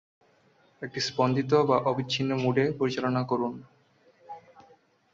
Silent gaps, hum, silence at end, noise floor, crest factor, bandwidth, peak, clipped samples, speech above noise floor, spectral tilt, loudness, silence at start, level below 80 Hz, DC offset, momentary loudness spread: none; none; 0.75 s; -63 dBFS; 20 dB; 7.8 kHz; -10 dBFS; under 0.1%; 37 dB; -6 dB/octave; -27 LUFS; 0.8 s; -68 dBFS; under 0.1%; 23 LU